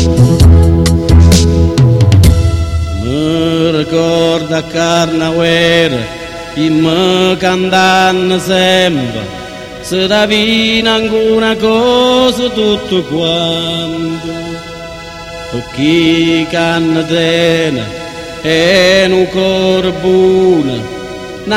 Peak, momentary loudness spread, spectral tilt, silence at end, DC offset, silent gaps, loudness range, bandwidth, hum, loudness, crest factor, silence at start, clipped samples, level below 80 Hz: 0 dBFS; 14 LU; -5.5 dB/octave; 0 s; under 0.1%; none; 4 LU; 15 kHz; none; -10 LUFS; 10 dB; 0 s; 0.3%; -22 dBFS